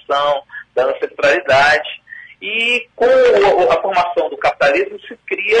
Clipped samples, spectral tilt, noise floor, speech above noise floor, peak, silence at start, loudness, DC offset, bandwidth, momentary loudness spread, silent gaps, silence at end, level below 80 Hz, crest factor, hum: under 0.1%; -3.5 dB/octave; -36 dBFS; 22 dB; -2 dBFS; 0.1 s; -14 LUFS; under 0.1%; 9.8 kHz; 13 LU; none; 0 s; -50 dBFS; 14 dB; none